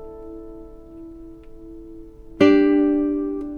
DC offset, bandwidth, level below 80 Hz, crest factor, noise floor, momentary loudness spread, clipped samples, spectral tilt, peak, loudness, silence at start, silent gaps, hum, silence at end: under 0.1%; 6.8 kHz; -44 dBFS; 20 dB; -40 dBFS; 26 LU; under 0.1%; -7 dB/octave; -2 dBFS; -18 LUFS; 0 s; none; none; 0 s